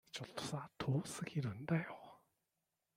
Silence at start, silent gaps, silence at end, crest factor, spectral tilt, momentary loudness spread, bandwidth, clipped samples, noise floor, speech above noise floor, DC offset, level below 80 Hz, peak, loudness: 0.15 s; none; 0.8 s; 18 dB; -5.5 dB/octave; 11 LU; 15.5 kHz; under 0.1%; -89 dBFS; 47 dB; under 0.1%; -74 dBFS; -24 dBFS; -43 LUFS